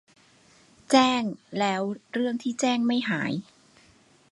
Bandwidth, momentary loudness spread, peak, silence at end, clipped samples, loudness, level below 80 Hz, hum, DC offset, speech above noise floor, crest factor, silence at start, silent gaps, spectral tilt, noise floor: 11.5 kHz; 10 LU; -6 dBFS; 0.9 s; under 0.1%; -26 LUFS; -72 dBFS; none; under 0.1%; 34 dB; 20 dB; 0.9 s; none; -4 dB/octave; -59 dBFS